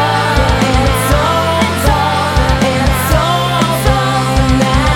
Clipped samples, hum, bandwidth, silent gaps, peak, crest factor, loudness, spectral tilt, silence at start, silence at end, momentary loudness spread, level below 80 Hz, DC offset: under 0.1%; none; 18.5 kHz; none; 0 dBFS; 12 dB; -12 LUFS; -5 dB/octave; 0 s; 0 s; 1 LU; -18 dBFS; under 0.1%